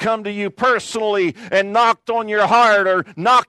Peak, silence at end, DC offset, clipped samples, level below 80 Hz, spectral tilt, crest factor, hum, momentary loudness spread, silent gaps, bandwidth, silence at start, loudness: -2 dBFS; 0.05 s; under 0.1%; under 0.1%; -64 dBFS; -4 dB/octave; 14 dB; none; 8 LU; none; 12.5 kHz; 0 s; -17 LUFS